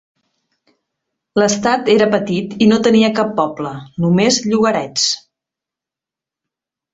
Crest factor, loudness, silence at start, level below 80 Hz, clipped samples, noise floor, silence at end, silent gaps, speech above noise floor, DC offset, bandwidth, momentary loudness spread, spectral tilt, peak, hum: 16 dB; -15 LUFS; 1.35 s; -56 dBFS; under 0.1%; -87 dBFS; 1.75 s; none; 72 dB; under 0.1%; 8 kHz; 8 LU; -4.5 dB/octave; 0 dBFS; none